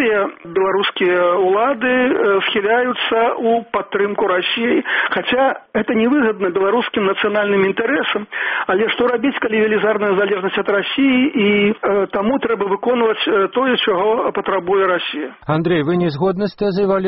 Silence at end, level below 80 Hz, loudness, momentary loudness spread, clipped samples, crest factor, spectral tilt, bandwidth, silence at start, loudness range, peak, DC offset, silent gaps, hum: 0 s; -54 dBFS; -16 LUFS; 5 LU; under 0.1%; 12 dB; -3 dB/octave; 5.6 kHz; 0 s; 1 LU; -4 dBFS; under 0.1%; none; none